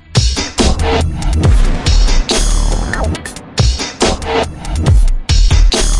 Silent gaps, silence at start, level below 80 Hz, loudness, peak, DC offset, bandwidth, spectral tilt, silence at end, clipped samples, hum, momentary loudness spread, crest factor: none; 0.1 s; -12 dBFS; -14 LUFS; 0 dBFS; under 0.1%; 11.5 kHz; -4.5 dB/octave; 0 s; under 0.1%; none; 5 LU; 12 dB